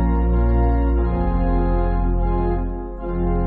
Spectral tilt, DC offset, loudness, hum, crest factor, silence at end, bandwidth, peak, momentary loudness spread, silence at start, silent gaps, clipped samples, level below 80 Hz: -10 dB/octave; under 0.1%; -21 LUFS; none; 10 dB; 0 s; 4.1 kHz; -8 dBFS; 7 LU; 0 s; none; under 0.1%; -20 dBFS